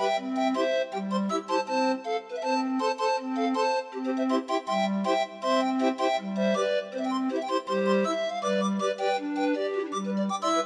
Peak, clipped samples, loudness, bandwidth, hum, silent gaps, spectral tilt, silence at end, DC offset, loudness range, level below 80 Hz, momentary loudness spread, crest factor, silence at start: -14 dBFS; under 0.1%; -28 LUFS; 11 kHz; none; none; -5 dB/octave; 0 s; under 0.1%; 1 LU; -84 dBFS; 4 LU; 14 dB; 0 s